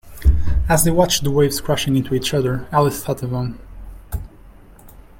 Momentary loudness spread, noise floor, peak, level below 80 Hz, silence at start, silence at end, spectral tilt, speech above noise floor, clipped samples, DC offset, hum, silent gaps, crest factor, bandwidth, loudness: 16 LU; -43 dBFS; -2 dBFS; -26 dBFS; 0.05 s; 0.3 s; -5 dB/octave; 25 dB; under 0.1%; under 0.1%; none; none; 18 dB; 17 kHz; -19 LUFS